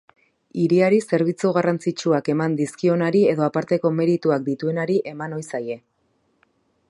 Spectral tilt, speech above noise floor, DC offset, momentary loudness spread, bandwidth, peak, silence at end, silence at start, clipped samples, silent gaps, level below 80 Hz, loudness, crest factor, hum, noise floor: -7 dB/octave; 47 dB; under 0.1%; 11 LU; 11.5 kHz; -4 dBFS; 1.1 s; 0.55 s; under 0.1%; none; -70 dBFS; -21 LUFS; 16 dB; none; -67 dBFS